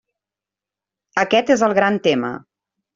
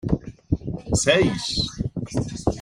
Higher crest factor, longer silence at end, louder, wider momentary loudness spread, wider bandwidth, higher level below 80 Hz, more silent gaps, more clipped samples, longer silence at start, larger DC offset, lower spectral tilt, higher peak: about the same, 18 dB vs 18 dB; first, 0.6 s vs 0 s; first, -18 LUFS vs -24 LUFS; about the same, 12 LU vs 10 LU; second, 7.8 kHz vs 15.5 kHz; second, -62 dBFS vs -38 dBFS; neither; neither; first, 1.15 s vs 0.05 s; neither; about the same, -4.5 dB/octave vs -4.5 dB/octave; about the same, -2 dBFS vs -4 dBFS